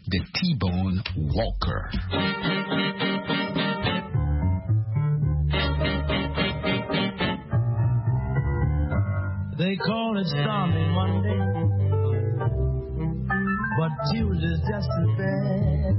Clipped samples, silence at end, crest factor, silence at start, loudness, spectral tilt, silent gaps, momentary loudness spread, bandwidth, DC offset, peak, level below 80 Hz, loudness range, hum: under 0.1%; 0 s; 14 dB; 0.05 s; -25 LUFS; -10.5 dB/octave; none; 3 LU; 5.8 kHz; under 0.1%; -10 dBFS; -34 dBFS; 1 LU; none